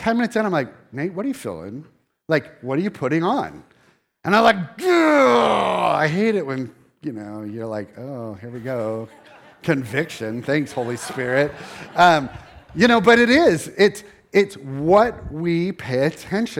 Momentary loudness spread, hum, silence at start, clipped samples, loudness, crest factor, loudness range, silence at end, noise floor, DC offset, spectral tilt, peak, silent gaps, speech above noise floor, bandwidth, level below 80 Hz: 18 LU; none; 0 s; under 0.1%; -19 LUFS; 18 dB; 10 LU; 0 s; -59 dBFS; under 0.1%; -5.5 dB/octave; -2 dBFS; none; 39 dB; 16.5 kHz; -52 dBFS